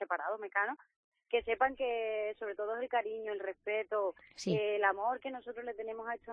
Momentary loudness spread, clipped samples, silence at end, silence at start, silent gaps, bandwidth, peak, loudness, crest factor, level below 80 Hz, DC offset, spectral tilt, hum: 10 LU; under 0.1%; 0 s; 0 s; 0.96-1.12 s; 4.6 kHz; -16 dBFS; -36 LUFS; 20 dB; -70 dBFS; under 0.1%; -2.5 dB/octave; none